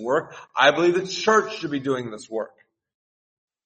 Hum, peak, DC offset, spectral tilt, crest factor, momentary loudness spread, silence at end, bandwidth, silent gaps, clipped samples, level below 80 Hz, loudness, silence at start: none; -2 dBFS; under 0.1%; -4 dB/octave; 22 dB; 14 LU; 1.2 s; 8.4 kHz; none; under 0.1%; -68 dBFS; -22 LUFS; 0 s